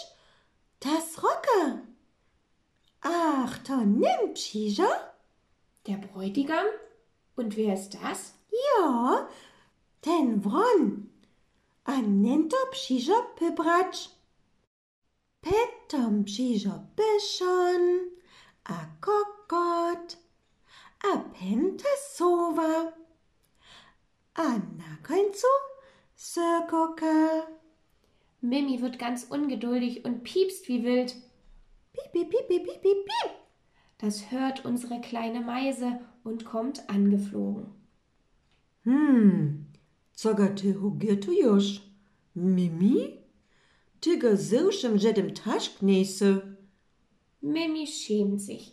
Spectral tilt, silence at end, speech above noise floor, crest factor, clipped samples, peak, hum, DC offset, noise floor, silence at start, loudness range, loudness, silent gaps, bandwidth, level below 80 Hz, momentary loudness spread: -6 dB/octave; 0.05 s; 44 dB; 18 dB; under 0.1%; -10 dBFS; none; under 0.1%; -71 dBFS; 0 s; 5 LU; -27 LUFS; 14.67-15.02 s; 13.5 kHz; -66 dBFS; 14 LU